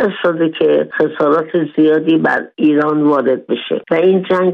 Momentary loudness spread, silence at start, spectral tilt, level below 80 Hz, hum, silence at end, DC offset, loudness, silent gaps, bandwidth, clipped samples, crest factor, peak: 5 LU; 0 s; -8.5 dB/octave; -62 dBFS; none; 0 s; under 0.1%; -14 LUFS; none; 5 kHz; under 0.1%; 10 dB; -2 dBFS